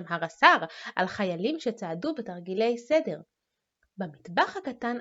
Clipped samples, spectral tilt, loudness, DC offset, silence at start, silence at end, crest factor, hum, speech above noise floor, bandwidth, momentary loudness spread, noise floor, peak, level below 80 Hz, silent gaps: under 0.1%; -5 dB/octave; -27 LUFS; under 0.1%; 0 s; 0 s; 26 dB; none; 54 dB; 8 kHz; 16 LU; -82 dBFS; -2 dBFS; -74 dBFS; none